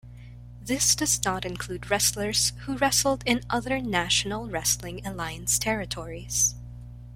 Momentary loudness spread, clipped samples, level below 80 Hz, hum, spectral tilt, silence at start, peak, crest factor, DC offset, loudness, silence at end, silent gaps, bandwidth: 13 LU; under 0.1%; -44 dBFS; 60 Hz at -40 dBFS; -2 dB/octave; 0.05 s; -4 dBFS; 22 dB; under 0.1%; -25 LUFS; 0 s; none; 16.5 kHz